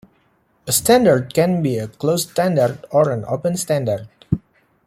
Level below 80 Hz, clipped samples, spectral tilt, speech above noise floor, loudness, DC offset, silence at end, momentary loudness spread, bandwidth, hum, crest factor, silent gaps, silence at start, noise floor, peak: -50 dBFS; under 0.1%; -5 dB/octave; 43 dB; -18 LUFS; under 0.1%; 0.5 s; 12 LU; 16.5 kHz; none; 16 dB; none; 0.65 s; -60 dBFS; -2 dBFS